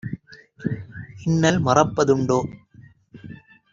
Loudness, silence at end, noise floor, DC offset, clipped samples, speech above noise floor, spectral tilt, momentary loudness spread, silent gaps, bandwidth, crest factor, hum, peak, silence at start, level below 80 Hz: -21 LUFS; 0.35 s; -50 dBFS; under 0.1%; under 0.1%; 30 dB; -6 dB/octave; 22 LU; none; 7.6 kHz; 22 dB; none; -2 dBFS; 0.05 s; -52 dBFS